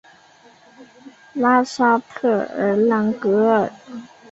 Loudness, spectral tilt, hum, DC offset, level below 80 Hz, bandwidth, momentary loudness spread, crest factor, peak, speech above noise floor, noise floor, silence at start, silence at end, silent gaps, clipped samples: -18 LUFS; -6.5 dB/octave; none; under 0.1%; -64 dBFS; 8 kHz; 17 LU; 16 dB; -4 dBFS; 31 dB; -50 dBFS; 0.8 s; 0.25 s; none; under 0.1%